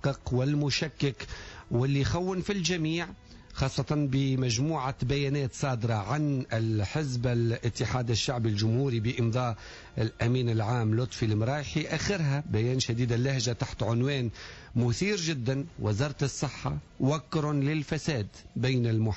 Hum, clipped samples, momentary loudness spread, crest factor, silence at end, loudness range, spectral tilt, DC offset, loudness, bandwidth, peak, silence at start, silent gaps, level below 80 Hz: none; under 0.1%; 6 LU; 14 dB; 0 s; 2 LU; -6 dB/octave; under 0.1%; -29 LUFS; 8 kHz; -16 dBFS; 0.05 s; none; -50 dBFS